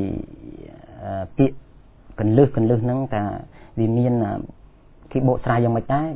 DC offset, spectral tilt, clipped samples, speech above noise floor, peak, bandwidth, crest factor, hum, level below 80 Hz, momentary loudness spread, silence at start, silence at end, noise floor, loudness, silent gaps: under 0.1%; -13 dB/octave; under 0.1%; 28 dB; -2 dBFS; 3.9 kHz; 20 dB; none; -44 dBFS; 21 LU; 0 s; 0 s; -47 dBFS; -21 LUFS; none